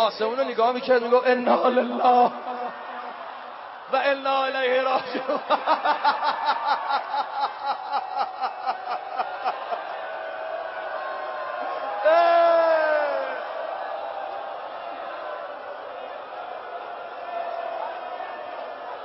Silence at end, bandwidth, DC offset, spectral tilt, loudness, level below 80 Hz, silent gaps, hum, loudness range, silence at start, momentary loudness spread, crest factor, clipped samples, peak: 0 s; 5.8 kHz; under 0.1%; -7 dB/octave; -25 LUFS; -80 dBFS; none; none; 11 LU; 0 s; 15 LU; 18 dB; under 0.1%; -6 dBFS